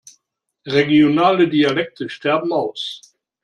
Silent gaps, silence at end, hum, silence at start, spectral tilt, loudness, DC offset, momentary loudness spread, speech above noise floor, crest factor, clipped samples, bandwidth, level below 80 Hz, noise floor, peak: none; 0.45 s; none; 0.65 s; -6 dB/octave; -17 LUFS; under 0.1%; 14 LU; 55 dB; 16 dB; under 0.1%; 9.4 kHz; -62 dBFS; -72 dBFS; -2 dBFS